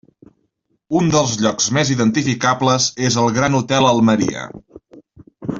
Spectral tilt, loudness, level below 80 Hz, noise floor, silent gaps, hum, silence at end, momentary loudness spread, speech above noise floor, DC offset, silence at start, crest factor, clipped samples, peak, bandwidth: -4.5 dB/octave; -16 LUFS; -50 dBFS; -67 dBFS; none; none; 0 s; 7 LU; 51 dB; under 0.1%; 0.9 s; 16 dB; under 0.1%; -2 dBFS; 7.8 kHz